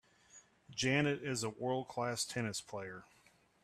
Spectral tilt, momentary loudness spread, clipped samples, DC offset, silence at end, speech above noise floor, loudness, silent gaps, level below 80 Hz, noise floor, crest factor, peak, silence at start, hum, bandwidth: -4 dB/octave; 14 LU; under 0.1%; under 0.1%; 0.6 s; 26 dB; -37 LUFS; none; -74 dBFS; -64 dBFS; 20 dB; -20 dBFS; 0.35 s; none; 14 kHz